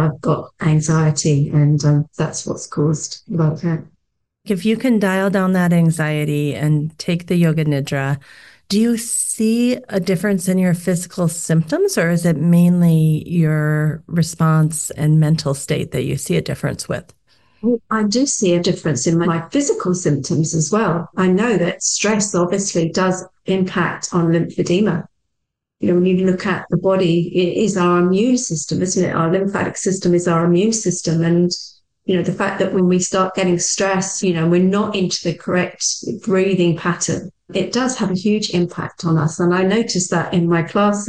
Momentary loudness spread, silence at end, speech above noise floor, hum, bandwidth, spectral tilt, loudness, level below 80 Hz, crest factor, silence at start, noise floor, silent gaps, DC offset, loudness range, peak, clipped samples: 6 LU; 0 s; 60 dB; none; 12.5 kHz; -5.5 dB/octave; -17 LUFS; -52 dBFS; 10 dB; 0 s; -77 dBFS; none; 0.2%; 3 LU; -6 dBFS; under 0.1%